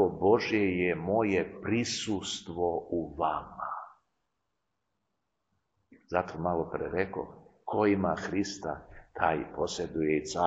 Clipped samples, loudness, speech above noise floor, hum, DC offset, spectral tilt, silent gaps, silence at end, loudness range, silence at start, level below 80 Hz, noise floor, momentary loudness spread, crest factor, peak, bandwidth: under 0.1%; -31 LUFS; 53 dB; none; under 0.1%; -5 dB/octave; none; 0 s; 8 LU; 0 s; -58 dBFS; -83 dBFS; 12 LU; 22 dB; -10 dBFS; 8.8 kHz